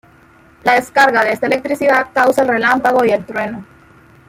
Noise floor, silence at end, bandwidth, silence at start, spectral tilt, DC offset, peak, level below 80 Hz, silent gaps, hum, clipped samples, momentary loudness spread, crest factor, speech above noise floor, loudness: -46 dBFS; 0.65 s; 16.5 kHz; 0.65 s; -4.5 dB/octave; under 0.1%; 0 dBFS; -54 dBFS; none; none; under 0.1%; 10 LU; 14 dB; 33 dB; -14 LUFS